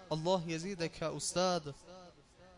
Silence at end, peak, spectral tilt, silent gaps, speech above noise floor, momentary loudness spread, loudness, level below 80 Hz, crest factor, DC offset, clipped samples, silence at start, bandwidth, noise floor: 0 s; -20 dBFS; -4 dB/octave; none; 24 dB; 20 LU; -36 LUFS; -64 dBFS; 18 dB; under 0.1%; under 0.1%; 0 s; 11 kHz; -60 dBFS